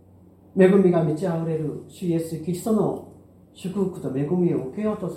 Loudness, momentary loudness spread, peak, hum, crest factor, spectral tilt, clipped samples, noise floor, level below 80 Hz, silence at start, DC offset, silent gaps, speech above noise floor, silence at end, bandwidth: -23 LUFS; 14 LU; -4 dBFS; none; 20 dB; -8 dB/octave; under 0.1%; -51 dBFS; -62 dBFS; 0.55 s; under 0.1%; none; 29 dB; 0 s; 15.5 kHz